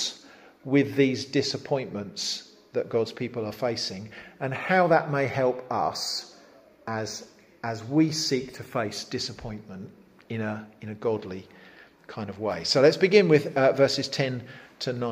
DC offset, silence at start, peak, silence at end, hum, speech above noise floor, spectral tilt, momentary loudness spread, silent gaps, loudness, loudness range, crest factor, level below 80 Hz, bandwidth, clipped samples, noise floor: under 0.1%; 0 s; -6 dBFS; 0 s; none; 28 dB; -5 dB/octave; 19 LU; none; -26 LUFS; 10 LU; 22 dB; -64 dBFS; 15.5 kHz; under 0.1%; -54 dBFS